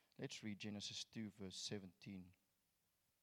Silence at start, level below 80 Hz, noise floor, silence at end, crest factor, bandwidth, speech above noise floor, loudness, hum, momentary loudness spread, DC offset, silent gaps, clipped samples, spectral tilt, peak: 0.2 s; -88 dBFS; -86 dBFS; 0.9 s; 18 dB; 18 kHz; 33 dB; -51 LUFS; none; 9 LU; under 0.1%; none; under 0.1%; -3.5 dB/octave; -36 dBFS